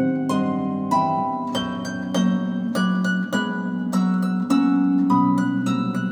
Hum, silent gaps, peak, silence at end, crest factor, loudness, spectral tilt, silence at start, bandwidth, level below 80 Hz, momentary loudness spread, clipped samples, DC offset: none; none; -6 dBFS; 0 s; 14 dB; -22 LUFS; -6.5 dB/octave; 0 s; 13 kHz; -64 dBFS; 7 LU; under 0.1%; under 0.1%